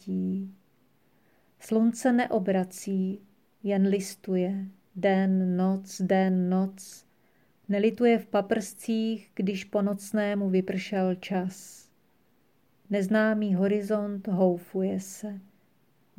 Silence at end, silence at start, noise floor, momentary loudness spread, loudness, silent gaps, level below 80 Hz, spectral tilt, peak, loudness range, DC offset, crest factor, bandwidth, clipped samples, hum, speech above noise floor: 0.75 s; 0.05 s; -68 dBFS; 12 LU; -28 LUFS; none; -76 dBFS; -6.5 dB/octave; -12 dBFS; 3 LU; under 0.1%; 16 dB; 15 kHz; under 0.1%; none; 41 dB